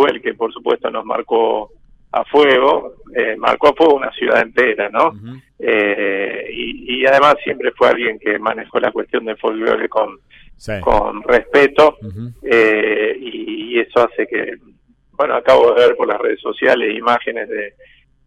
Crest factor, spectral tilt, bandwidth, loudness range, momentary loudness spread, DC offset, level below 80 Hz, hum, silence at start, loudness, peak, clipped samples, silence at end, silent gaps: 14 dB; -5.5 dB/octave; 9.6 kHz; 3 LU; 13 LU; under 0.1%; -42 dBFS; none; 0 s; -15 LUFS; -2 dBFS; under 0.1%; 0.6 s; none